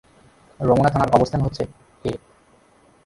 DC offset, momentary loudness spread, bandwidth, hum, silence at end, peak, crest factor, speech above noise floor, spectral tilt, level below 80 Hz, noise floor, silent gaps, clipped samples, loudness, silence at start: under 0.1%; 14 LU; 11.5 kHz; none; 0.9 s; 0 dBFS; 22 dB; 37 dB; -7.5 dB/octave; -42 dBFS; -55 dBFS; none; under 0.1%; -21 LUFS; 0.6 s